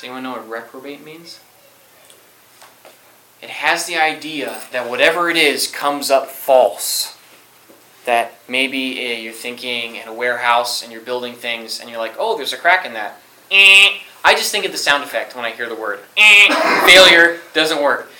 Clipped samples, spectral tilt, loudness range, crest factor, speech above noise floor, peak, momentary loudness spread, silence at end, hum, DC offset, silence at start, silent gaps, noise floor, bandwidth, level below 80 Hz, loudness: 0.2%; -0.5 dB/octave; 12 LU; 16 dB; 33 dB; 0 dBFS; 20 LU; 0.15 s; none; under 0.1%; 0 s; none; -48 dBFS; over 20 kHz; -60 dBFS; -13 LUFS